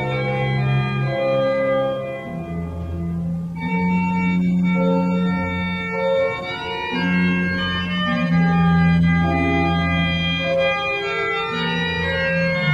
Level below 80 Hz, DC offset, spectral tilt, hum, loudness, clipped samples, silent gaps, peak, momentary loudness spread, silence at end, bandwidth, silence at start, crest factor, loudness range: -40 dBFS; under 0.1%; -7.5 dB/octave; none; -20 LUFS; under 0.1%; none; -6 dBFS; 9 LU; 0 s; 7.2 kHz; 0 s; 14 dB; 4 LU